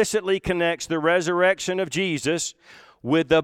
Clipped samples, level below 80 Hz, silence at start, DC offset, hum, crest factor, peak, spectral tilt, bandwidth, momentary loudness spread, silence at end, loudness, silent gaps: under 0.1%; -50 dBFS; 0 s; under 0.1%; none; 16 dB; -6 dBFS; -4 dB/octave; 16 kHz; 5 LU; 0 s; -23 LUFS; none